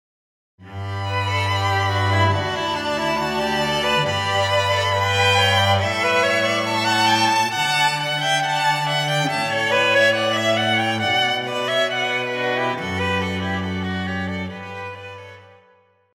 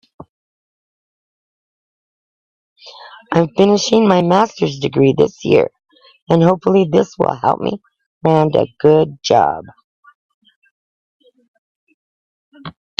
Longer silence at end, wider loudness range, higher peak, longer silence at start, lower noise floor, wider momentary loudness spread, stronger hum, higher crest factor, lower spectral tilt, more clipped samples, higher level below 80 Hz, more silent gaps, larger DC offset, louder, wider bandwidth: first, 0.7 s vs 0.3 s; about the same, 6 LU vs 6 LU; second, -4 dBFS vs 0 dBFS; second, 0.6 s vs 2.85 s; second, -57 dBFS vs under -90 dBFS; about the same, 9 LU vs 11 LU; neither; about the same, 16 dB vs 18 dB; second, -4 dB/octave vs -6.5 dB/octave; neither; about the same, -54 dBFS vs -56 dBFS; second, none vs 6.22-6.27 s, 8.06-8.21 s, 9.84-10.03 s, 10.15-10.42 s, 10.56-10.62 s, 10.71-11.20 s, 11.48-11.87 s, 11.94-12.52 s; neither; second, -19 LUFS vs -14 LUFS; first, 16.5 kHz vs 7.8 kHz